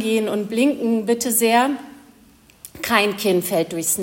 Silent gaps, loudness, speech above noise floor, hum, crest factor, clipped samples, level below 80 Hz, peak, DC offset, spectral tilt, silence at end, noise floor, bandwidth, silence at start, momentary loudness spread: none; -19 LUFS; 32 dB; none; 20 dB; under 0.1%; -60 dBFS; -2 dBFS; under 0.1%; -3 dB/octave; 0 s; -51 dBFS; 17 kHz; 0 s; 6 LU